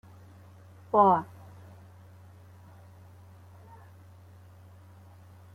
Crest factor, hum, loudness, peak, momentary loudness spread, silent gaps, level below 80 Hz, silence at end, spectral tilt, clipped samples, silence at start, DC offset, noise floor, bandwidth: 24 dB; none; -24 LUFS; -8 dBFS; 31 LU; none; -72 dBFS; 4.3 s; -8.5 dB/octave; under 0.1%; 0.95 s; under 0.1%; -52 dBFS; 15.5 kHz